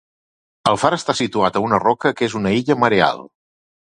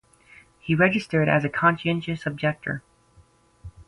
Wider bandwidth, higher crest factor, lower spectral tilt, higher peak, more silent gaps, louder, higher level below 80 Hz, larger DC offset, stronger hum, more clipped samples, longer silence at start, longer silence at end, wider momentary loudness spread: about the same, 11 kHz vs 11 kHz; about the same, 18 dB vs 20 dB; second, -5 dB/octave vs -7.5 dB/octave; first, 0 dBFS vs -6 dBFS; neither; first, -18 LUFS vs -23 LUFS; about the same, -52 dBFS vs -54 dBFS; neither; neither; neither; about the same, 0.65 s vs 0.65 s; first, 0.75 s vs 0.05 s; second, 5 LU vs 12 LU